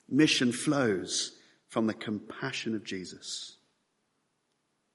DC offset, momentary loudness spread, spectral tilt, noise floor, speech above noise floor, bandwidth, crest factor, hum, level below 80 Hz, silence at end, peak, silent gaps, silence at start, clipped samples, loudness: under 0.1%; 14 LU; -3.5 dB/octave; -77 dBFS; 47 dB; 11.5 kHz; 22 dB; none; -76 dBFS; 1.4 s; -10 dBFS; none; 0.1 s; under 0.1%; -31 LUFS